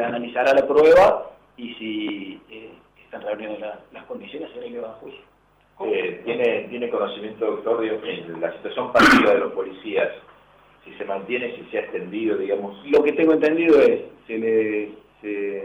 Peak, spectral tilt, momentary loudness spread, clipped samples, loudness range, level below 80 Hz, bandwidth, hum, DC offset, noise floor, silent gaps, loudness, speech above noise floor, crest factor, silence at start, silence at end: -6 dBFS; -5 dB/octave; 21 LU; under 0.1%; 13 LU; -54 dBFS; 14 kHz; none; under 0.1%; -53 dBFS; none; -21 LUFS; 32 dB; 14 dB; 0 s; 0 s